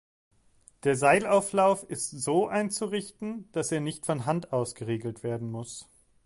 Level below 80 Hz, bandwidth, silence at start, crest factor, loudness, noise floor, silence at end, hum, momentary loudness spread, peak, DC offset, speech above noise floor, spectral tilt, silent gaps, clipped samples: -66 dBFS; 11.5 kHz; 0.85 s; 20 dB; -28 LUFS; -61 dBFS; 0.4 s; none; 13 LU; -8 dBFS; under 0.1%; 33 dB; -5 dB/octave; none; under 0.1%